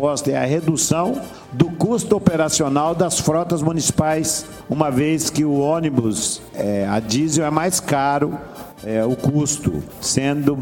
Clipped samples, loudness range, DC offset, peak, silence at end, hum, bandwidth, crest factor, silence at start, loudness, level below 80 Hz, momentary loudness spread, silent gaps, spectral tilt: under 0.1%; 2 LU; under 0.1%; 0 dBFS; 0 s; none; 17.5 kHz; 18 dB; 0 s; -19 LUFS; -48 dBFS; 7 LU; none; -4.5 dB/octave